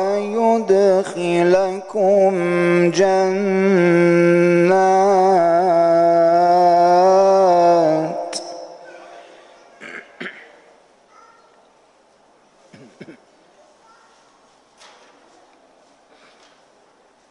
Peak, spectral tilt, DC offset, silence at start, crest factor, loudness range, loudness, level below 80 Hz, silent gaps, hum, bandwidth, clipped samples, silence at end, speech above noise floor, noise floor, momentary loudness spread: -4 dBFS; -6.5 dB/octave; under 0.1%; 0 s; 12 dB; 9 LU; -15 LUFS; -68 dBFS; none; none; 10.5 kHz; under 0.1%; 4.2 s; 39 dB; -54 dBFS; 18 LU